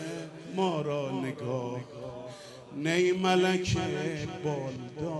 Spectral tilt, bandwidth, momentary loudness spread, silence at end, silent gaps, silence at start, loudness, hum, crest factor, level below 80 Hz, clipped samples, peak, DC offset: -5.5 dB/octave; 11.5 kHz; 16 LU; 0 s; none; 0 s; -30 LUFS; none; 16 dB; -58 dBFS; under 0.1%; -14 dBFS; under 0.1%